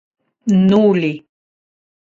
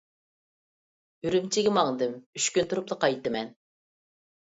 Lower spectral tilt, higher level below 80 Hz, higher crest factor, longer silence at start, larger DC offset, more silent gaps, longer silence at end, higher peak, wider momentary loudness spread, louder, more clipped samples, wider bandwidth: first, -8 dB/octave vs -3.5 dB/octave; first, -56 dBFS vs -68 dBFS; second, 14 dB vs 22 dB; second, 0.45 s vs 1.25 s; neither; second, none vs 2.26-2.33 s; about the same, 1 s vs 1.1 s; first, -2 dBFS vs -8 dBFS; first, 14 LU vs 9 LU; first, -14 LUFS vs -27 LUFS; neither; second, 7.4 kHz vs 8.2 kHz